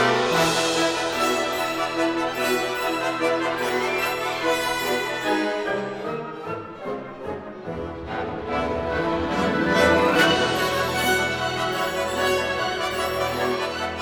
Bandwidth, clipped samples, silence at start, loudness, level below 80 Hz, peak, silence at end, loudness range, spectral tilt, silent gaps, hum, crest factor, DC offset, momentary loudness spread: 19 kHz; under 0.1%; 0 s; -23 LUFS; -50 dBFS; -4 dBFS; 0 s; 8 LU; -3.5 dB/octave; none; none; 20 dB; under 0.1%; 13 LU